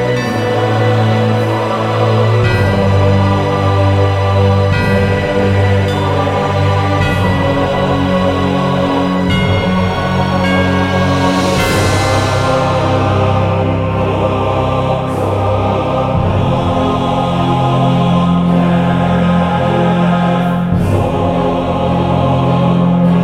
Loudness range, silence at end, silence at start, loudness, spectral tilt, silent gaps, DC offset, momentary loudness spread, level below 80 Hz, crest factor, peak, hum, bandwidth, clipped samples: 2 LU; 0 s; 0 s; -13 LUFS; -7 dB/octave; none; under 0.1%; 3 LU; -32 dBFS; 12 dB; 0 dBFS; none; 13.5 kHz; under 0.1%